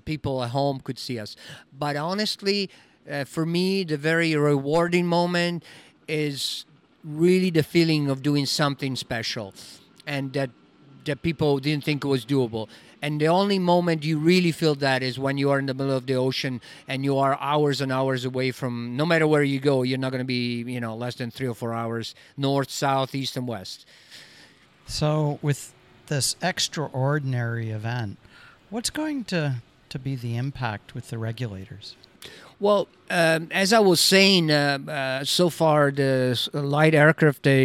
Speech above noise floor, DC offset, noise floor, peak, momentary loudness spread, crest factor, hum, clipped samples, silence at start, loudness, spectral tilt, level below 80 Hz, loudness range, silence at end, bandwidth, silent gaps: 30 dB; under 0.1%; -53 dBFS; -4 dBFS; 14 LU; 22 dB; none; under 0.1%; 0.05 s; -24 LUFS; -5 dB/octave; -58 dBFS; 9 LU; 0 s; 16 kHz; none